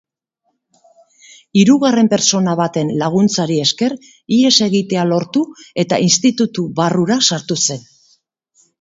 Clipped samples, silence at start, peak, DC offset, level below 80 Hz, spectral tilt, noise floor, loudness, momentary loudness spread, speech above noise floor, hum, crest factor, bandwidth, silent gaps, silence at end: under 0.1%; 1.55 s; 0 dBFS; under 0.1%; -60 dBFS; -4 dB/octave; -69 dBFS; -14 LUFS; 8 LU; 55 dB; none; 16 dB; 8 kHz; none; 1 s